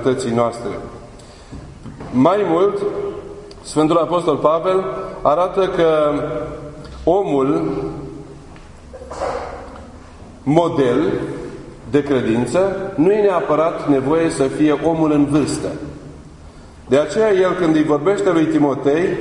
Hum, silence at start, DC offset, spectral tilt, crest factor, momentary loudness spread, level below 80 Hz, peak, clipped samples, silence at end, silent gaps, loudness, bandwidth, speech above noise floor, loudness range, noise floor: none; 0 s; under 0.1%; -6.5 dB/octave; 18 dB; 19 LU; -42 dBFS; 0 dBFS; under 0.1%; 0 s; none; -17 LUFS; 11 kHz; 23 dB; 6 LU; -39 dBFS